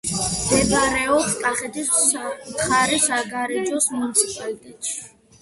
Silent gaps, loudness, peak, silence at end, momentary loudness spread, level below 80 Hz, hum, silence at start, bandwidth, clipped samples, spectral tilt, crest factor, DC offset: none; -20 LUFS; -2 dBFS; 0.35 s; 11 LU; -46 dBFS; none; 0.05 s; 12 kHz; under 0.1%; -2 dB/octave; 20 dB; under 0.1%